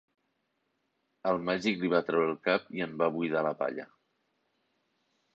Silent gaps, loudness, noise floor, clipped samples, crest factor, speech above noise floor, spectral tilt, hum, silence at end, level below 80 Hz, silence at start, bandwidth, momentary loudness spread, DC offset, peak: none; -30 LUFS; -79 dBFS; under 0.1%; 20 dB; 49 dB; -6 dB/octave; none; 1.5 s; -72 dBFS; 1.25 s; 8 kHz; 8 LU; under 0.1%; -14 dBFS